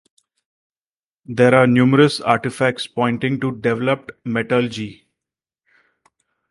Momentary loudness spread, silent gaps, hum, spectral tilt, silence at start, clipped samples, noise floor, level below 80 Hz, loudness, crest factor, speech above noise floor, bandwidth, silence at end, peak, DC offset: 12 LU; none; none; -6.5 dB/octave; 1.3 s; under 0.1%; under -90 dBFS; -58 dBFS; -18 LUFS; 20 dB; over 73 dB; 11.5 kHz; 1.55 s; 0 dBFS; under 0.1%